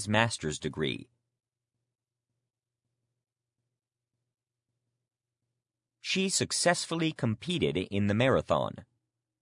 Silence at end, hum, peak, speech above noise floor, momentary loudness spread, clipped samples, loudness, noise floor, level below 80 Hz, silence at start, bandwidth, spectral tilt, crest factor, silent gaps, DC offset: 0.6 s; none; -8 dBFS; 59 dB; 9 LU; under 0.1%; -29 LUFS; -89 dBFS; -64 dBFS; 0 s; 11 kHz; -4 dB/octave; 26 dB; none; under 0.1%